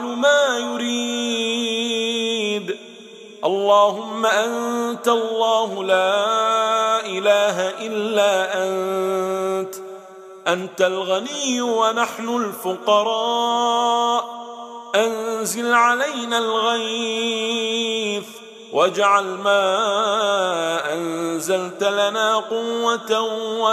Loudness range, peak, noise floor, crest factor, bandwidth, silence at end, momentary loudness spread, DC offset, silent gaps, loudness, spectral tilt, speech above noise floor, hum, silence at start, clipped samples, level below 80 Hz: 3 LU; -4 dBFS; -40 dBFS; 16 dB; 15.5 kHz; 0 s; 8 LU; under 0.1%; none; -20 LUFS; -2.5 dB/octave; 21 dB; none; 0 s; under 0.1%; -78 dBFS